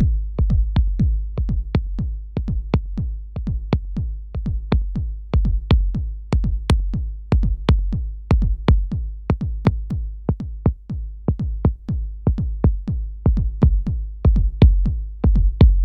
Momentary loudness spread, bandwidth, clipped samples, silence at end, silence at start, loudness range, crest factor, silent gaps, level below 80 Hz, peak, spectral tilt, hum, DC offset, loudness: 9 LU; 5.4 kHz; under 0.1%; 0 s; 0 s; 5 LU; 18 dB; none; -20 dBFS; -2 dBFS; -9 dB/octave; none; under 0.1%; -22 LUFS